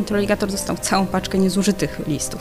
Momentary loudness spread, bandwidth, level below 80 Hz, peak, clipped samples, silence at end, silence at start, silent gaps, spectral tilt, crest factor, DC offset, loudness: 5 LU; 16 kHz; -40 dBFS; -4 dBFS; under 0.1%; 0 s; 0 s; none; -4.5 dB/octave; 16 dB; under 0.1%; -20 LUFS